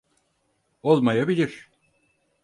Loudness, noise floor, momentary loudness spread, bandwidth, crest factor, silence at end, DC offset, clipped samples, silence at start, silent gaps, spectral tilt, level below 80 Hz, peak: -22 LUFS; -71 dBFS; 11 LU; 11 kHz; 20 dB; 0.85 s; under 0.1%; under 0.1%; 0.85 s; none; -7.5 dB/octave; -68 dBFS; -6 dBFS